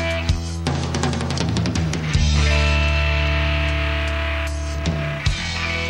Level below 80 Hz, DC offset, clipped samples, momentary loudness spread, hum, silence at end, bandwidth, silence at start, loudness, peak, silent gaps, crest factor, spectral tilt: -24 dBFS; 0.3%; under 0.1%; 6 LU; none; 0 s; 10.5 kHz; 0 s; -21 LUFS; -6 dBFS; none; 14 dB; -5 dB/octave